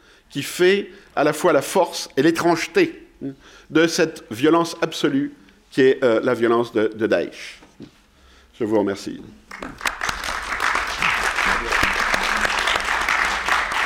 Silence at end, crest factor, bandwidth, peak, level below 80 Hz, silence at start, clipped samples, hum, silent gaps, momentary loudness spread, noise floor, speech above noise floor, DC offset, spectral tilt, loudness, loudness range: 0 s; 14 dB; 17 kHz; -6 dBFS; -44 dBFS; 0.3 s; under 0.1%; none; none; 13 LU; -52 dBFS; 32 dB; under 0.1%; -4 dB/octave; -20 LUFS; 6 LU